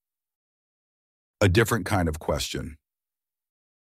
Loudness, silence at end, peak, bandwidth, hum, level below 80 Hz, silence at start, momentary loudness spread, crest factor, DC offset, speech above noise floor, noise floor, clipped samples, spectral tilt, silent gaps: -25 LUFS; 1.1 s; -6 dBFS; 16 kHz; none; -44 dBFS; 1.4 s; 12 LU; 22 dB; under 0.1%; over 66 dB; under -90 dBFS; under 0.1%; -5 dB/octave; none